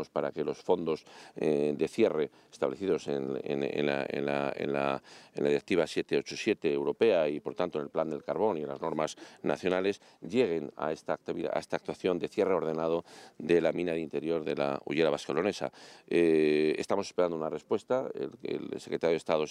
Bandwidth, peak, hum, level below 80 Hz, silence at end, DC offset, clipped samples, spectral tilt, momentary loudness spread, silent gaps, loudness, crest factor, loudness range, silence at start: 11.5 kHz; -12 dBFS; none; -70 dBFS; 0 s; under 0.1%; under 0.1%; -5.5 dB/octave; 8 LU; none; -31 LUFS; 18 dB; 3 LU; 0 s